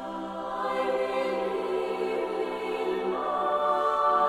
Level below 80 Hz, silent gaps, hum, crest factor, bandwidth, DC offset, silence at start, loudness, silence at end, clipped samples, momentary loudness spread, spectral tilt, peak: -64 dBFS; none; none; 16 dB; 15 kHz; under 0.1%; 0 s; -28 LUFS; 0 s; under 0.1%; 6 LU; -5 dB/octave; -12 dBFS